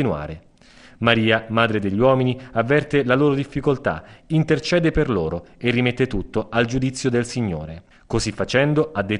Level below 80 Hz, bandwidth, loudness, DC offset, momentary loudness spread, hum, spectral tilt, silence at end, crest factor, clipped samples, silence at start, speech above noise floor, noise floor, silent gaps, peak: -40 dBFS; 11 kHz; -20 LUFS; under 0.1%; 9 LU; none; -6 dB/octave; 0 s; 20 dB; under 0.1%; 0 s; 28 dB; -48 dBFS; none; -2 dBFS